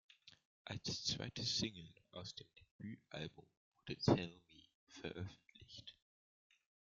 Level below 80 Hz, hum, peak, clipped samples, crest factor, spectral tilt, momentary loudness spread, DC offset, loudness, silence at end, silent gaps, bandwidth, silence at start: -70 dBFS; none; -20 dBFS; under 0.1%; 28 dB; -4.5 dB/octave; 23 LU; under 0.1%; -43 LUFS; 1.05 s; 0.45-0.65 s, 2.71-2.79 s, 3.57-3.72 s, 4.75-4.87 s; 9.2 kHz; 0.25 s